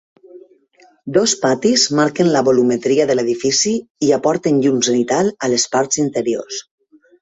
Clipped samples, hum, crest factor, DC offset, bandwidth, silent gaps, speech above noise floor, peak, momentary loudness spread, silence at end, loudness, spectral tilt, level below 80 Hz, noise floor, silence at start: under 0.1%; none; 16 dB; under 0.1%; 8.4 kHz; 3.90-3.95 s; 37 dB; 0 dBFS; 6 LU; 0.6 s; -16 LUFS; -3.5 dB/octave; -58 dBFS; -52 dBFS; 0.35 s